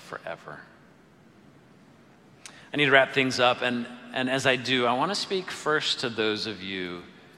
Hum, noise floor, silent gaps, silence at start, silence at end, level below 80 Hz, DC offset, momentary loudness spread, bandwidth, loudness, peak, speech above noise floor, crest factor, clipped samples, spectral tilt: none; -55 dBFS; none; 0 s; 0.3 s; -70 dBFS; under 0.1%; 20 LU; 14 kHz; -25 LUFS; -4 dBFS; 29 dB; 24 dB; under 0.1%; -3.5 dB/octave